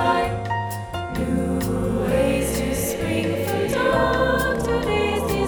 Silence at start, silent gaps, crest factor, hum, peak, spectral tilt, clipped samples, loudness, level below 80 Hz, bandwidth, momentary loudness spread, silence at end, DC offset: 0 s; none; 14 dB; none; -6 dBFS; -5.5 dB/octave; under 0.1%; -22 LUFS; -34 dBFS; over 20 kHz; 7 LU; 0 s; under 0.1%